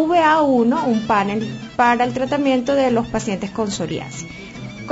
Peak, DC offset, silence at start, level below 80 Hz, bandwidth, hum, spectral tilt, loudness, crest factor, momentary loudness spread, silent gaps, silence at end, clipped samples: -4 dBFS; under 0.1%; 0 s; -48 dBFS; 8 kHz; none; -5 dB/octave; -18 LUFS; 14 dB; 17 LU; none; 0 s; under 0.1%